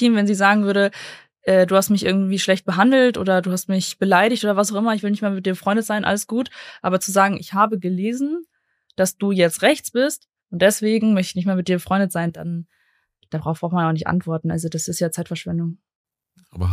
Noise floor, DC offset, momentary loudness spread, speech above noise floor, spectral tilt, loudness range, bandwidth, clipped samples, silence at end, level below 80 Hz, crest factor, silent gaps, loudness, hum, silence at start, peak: -64 dBFS; under 0.1%; 11 LU; 44 dB; -5 dB/octave; 7 LU; 15.5 kHz; under 0.1%; 0 s; -52 dBFS; 18 dB; 15.95-16.05 s; -20 LUFS; none; 0 s; -2 dBFS